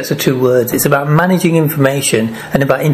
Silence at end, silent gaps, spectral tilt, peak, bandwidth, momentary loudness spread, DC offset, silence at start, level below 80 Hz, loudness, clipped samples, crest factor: 0 s; none; -5.5 dB/octave; 0 dBFS; 15 kHz; 4 LU; under 0.1%; 0 s; -46 dBFS; -12 LUFS; under 0.1%; 12 dB